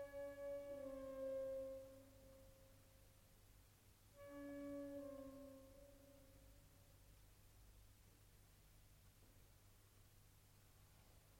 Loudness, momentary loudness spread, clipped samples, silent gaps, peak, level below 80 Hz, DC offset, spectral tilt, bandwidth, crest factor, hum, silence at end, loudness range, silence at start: -54 LUFS; 20 LU; under 0.1%; none; -42 dBFS; -72 dBFS; under 0.1%; -5.5 dB/octave; 16.5 kHz; 16 dB; none; 0 s; 16 LU; 0 s